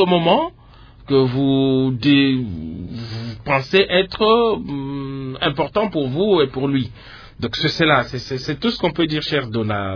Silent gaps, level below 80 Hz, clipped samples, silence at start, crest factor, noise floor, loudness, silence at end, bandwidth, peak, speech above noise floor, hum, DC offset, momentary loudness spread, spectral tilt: none; -44 dBFS; under 0.1%; 0 s; 18 dB; -44 dBFS; -18 LUFS; 0 s; 5.4 kHz; -2 dBFS; 25 dB; none; under 0.1%; 13 LU; -7 dB/octave